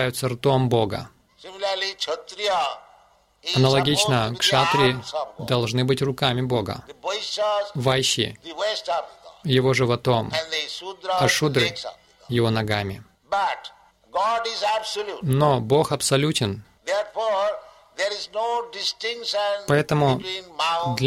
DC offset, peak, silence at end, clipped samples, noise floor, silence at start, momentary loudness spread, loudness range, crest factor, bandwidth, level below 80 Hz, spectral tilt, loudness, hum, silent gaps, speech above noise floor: under 0.1%; -4 dBFS; 0 s; under 0.1%; -57 dBFS; 0 s; 12 LU; 4 LU; 18 dB; 16 kHz; -54 dBFS; -4.5 dB/octave; -23 LUFS; none; none; 34 dB